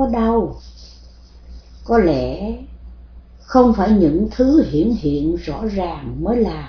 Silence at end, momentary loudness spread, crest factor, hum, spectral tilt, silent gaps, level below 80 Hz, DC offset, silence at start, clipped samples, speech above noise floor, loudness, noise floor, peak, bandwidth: 0 s; 13 LU; 18 dB; none; -8.5 dB/octave; none; -32 dBFS; under 0.1%; 0 s; under 0.1%; 25 dB; -17 LUFS; -42 dBFS; 0 dBFS; 5.4 kHz